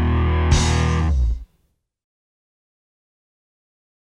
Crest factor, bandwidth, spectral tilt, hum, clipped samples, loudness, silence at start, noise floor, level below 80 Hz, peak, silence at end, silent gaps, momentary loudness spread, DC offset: 18 dB; 10.5 kHz; -5.5 dB/octave; none; under 0.1%; -19 LUFS; 0 s; -66 dBFS; -26 dBFS; -4 dBFS; 2.7 s; none; 7 LU; under 0.1%